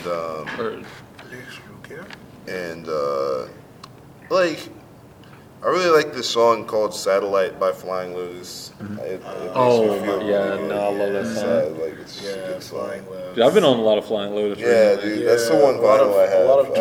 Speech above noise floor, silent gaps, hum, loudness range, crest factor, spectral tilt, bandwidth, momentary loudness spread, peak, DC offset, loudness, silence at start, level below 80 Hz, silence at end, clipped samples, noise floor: 24 dB; none; none; 10 LU; 18 dB; -4.5 dB/octave; 17 kHz; 21 LU; -2 dBFS; under 0.1%; -20 LUFS; 0 s; -60 dBFS; 0 s; under 0.1%; -45 dBFS